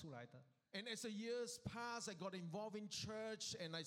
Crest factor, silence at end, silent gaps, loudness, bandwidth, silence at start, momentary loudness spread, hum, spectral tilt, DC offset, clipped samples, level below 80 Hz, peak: 16 dB; 0 s; none; -49 LUFS; 16 kHz; 0 s; 8 LU; none; -3.5 dB/octave; under 0.1%; under 0.1%; -78 dBFS; -34 dBFS